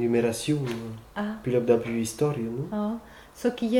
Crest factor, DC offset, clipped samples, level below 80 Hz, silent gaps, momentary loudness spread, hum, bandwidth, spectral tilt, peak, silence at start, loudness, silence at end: 18 dB; under 0.1%; under 0.1%; -56 dBFS; none; 11 LU; none; 17.5 kHz; -6 dB/octave; -8 dBFS; 0 s; -28 LUFS; 0 s